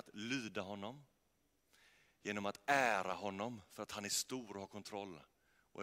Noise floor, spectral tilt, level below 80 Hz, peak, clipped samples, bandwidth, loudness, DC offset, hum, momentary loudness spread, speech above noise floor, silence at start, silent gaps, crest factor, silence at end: -80 dBFS; -3 dB/octave; -82 dBFS; -20 dBFS; under 0.1%; 16 kHz; -41 LUFS; under 0.1%; none; 16 LU; 39 dB; 0.05 s; none; 22 dB; 0 s